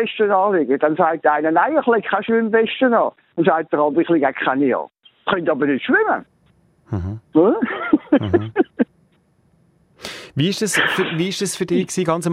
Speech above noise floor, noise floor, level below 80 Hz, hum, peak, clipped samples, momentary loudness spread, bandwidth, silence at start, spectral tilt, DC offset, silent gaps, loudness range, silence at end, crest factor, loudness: 41 dB; -59 dBFS; -54 dBFS; none; -2 dBFS; under 0.1%; 8 LU; 15.5 kHz; 0 s; -5 dB/octave; under 0.1%; none; 4 LU; 0 s; 16 dB; -18 LUFS